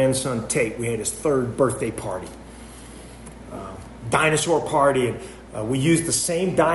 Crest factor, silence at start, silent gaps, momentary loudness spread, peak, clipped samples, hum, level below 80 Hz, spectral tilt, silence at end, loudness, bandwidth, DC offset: 18 dB; 0 s; none; 22 LU; -4 dBFS; under 0.1%; none; -46 dBFS; -4.5 dB/octave; 0 s; -22 LUFS; 12 kHz; under 0.1%